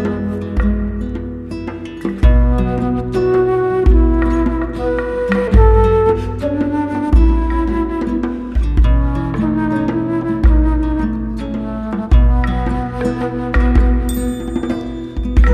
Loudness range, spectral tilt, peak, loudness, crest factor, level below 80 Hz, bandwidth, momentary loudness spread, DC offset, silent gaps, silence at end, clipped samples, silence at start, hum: 3 LU; -8.5 dB/octave; 0 dBFS; -16 LUFS; 14 dB; -16 dBFS; 8.8 kHz; 10 LU; under 0.1%; none; 0 s; under 0.1%; 0 s; none